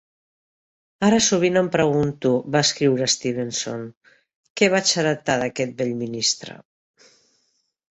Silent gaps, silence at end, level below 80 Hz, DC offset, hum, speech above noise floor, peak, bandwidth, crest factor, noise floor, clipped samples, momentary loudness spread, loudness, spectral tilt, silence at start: 3.97-4.01 s, 4.35-4.44 s, 4.50-4.55 s; 1.4 s; -58 dBFS; under 0.1%; none; 49 dB; -4 dBFS; 8.2 kHz; 20 dB; -69 dBFS; under 0.1%; 10 LU; -20 LUFS; -3.5 dB/octave; 1 s